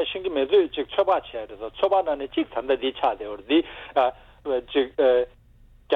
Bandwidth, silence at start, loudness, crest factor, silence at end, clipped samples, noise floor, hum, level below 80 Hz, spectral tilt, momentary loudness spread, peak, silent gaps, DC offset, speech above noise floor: 4.5 kHz; 0 s; -24 LUFS; 16 dB; 0 s; under 0.1%; -53 dBFS; none; -54 dBFS; -6.5 dB/octave; 12 LU; -8 dBFS; none; under 0.1%; 29 dB